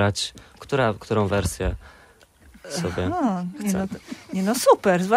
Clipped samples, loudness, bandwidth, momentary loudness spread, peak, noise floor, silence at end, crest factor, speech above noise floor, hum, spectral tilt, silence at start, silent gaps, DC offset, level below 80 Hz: under 0.1%; -24 LUFS; 16 kHz; 13 LU; -4 dBFS; -53 dBFS; 0 s; 20 dB; 30 dB; none; -5 dB/octave; 0 s; none; under 0.1%; -42 dBFS